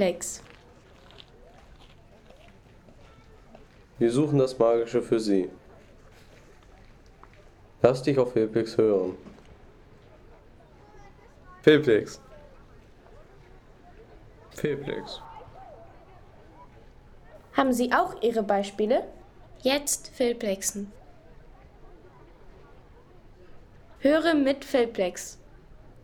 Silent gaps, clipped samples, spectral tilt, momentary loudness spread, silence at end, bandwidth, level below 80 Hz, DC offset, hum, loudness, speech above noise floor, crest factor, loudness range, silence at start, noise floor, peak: none; under 0.1%; -5 dB/octave; 19 LU; 0.15 s; 18.5 kHz; -54 dBFS; under 0.1%; none; -25 LUFS; 28 dB; 22 dB; 11 LU; 0 s; -53 dBFS; -6 dBFS